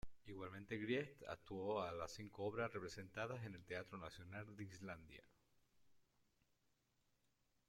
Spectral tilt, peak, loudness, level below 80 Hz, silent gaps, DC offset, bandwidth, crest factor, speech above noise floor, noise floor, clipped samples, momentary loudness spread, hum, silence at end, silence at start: -5.5 dB/octave; -30 dBFS; -49 LUFS; -72 dBFS; none; under 0.1%; 16.5 kHz; 20 dB; 35 dB; -84 dBFS; under 0.1%; 10 LU; none; 1.65 s; 0.05 s